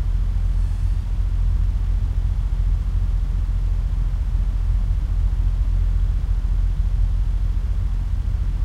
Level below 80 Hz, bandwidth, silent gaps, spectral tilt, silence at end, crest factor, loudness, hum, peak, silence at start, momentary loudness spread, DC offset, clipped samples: -20 dBFS; 4.2 kHz; none; -8 dB/octave; 0 s; 10 dB; -24 LUFS; none; -8 dBFS; 0 s; 2 LU; under 0.1%; under 0.1%